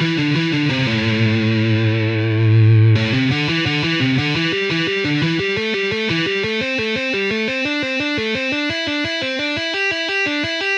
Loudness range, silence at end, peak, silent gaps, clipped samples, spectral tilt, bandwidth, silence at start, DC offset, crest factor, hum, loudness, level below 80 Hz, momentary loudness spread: 3 LU; 0 s; -4 dBFS; none; under 0.1%; -6 dB/octave; 8.2 kHz; 0 s; under 0.1%; 14 dB; none; -17 LUFS; -52 dBFS; 5 LU